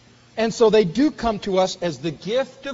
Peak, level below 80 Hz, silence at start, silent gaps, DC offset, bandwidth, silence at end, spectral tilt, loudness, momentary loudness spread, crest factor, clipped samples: -6 dBFS; -48 dBFS; 0.35 s; none; under 0.1%; 8 kHz; 0 s; -4.5 dB/octave; -21 LUFS; 10 LU; 16 dB; under 0.1%